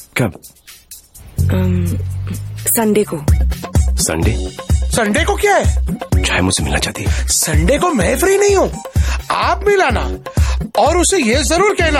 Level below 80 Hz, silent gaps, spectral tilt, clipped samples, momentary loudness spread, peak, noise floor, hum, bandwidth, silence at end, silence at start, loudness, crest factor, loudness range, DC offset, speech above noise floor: -22 dBFS; none; -4.5 dB/octave; under 0.1%; 8 LU; -2 dBFS; -39 dBFS; none; 17 kHz; 0 s; 0 s; -15 LUFS; 12 dB; 3 LU; under 0.1%; 24 dB